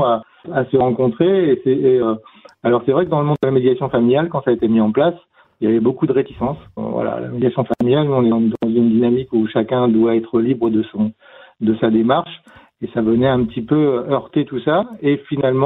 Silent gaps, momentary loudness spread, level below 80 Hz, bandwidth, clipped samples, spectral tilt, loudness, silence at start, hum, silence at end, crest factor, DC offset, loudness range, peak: none; 8 LU; -50 dBFS; 4.1 kHz; under 0.1%; -10.5 dB/octave; -17 LUFS; 0 s; none; 0 s; 16 dB; under 0.1%; 2 LU; -2 dBFS